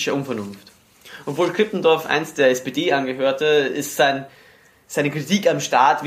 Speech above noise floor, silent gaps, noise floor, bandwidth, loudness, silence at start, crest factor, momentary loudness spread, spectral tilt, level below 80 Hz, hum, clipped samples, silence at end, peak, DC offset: 24 dB; none; -44 dBFS; 15.5 kHz; -20 LUFS; 0 s; 18 dB; 11 LU; -4 dB/octave; -68 dBFS; none; under 0.1%; 0 s; -2 dBFS; under 0.1%